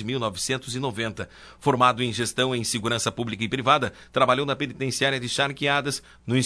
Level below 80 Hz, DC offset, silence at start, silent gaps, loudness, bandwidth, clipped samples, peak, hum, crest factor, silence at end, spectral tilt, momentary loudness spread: -56 dBFS; under 0.1%; 0 s; none; -24 LUFS; 11 kHz; under 0.1%; -4 dBFS; none; 20 dB; 0 s; -4 dB/octave; 9 LU